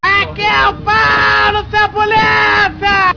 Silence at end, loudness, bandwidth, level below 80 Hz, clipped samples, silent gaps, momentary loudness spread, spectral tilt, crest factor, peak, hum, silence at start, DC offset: 0 s; -11 LUFS; 5.4 kHz; -34 dBFS; under 0.1%; none; 3 LU; -4 dB/octave; 8 dB; -2 dBFS; none; 0 s; 0.6%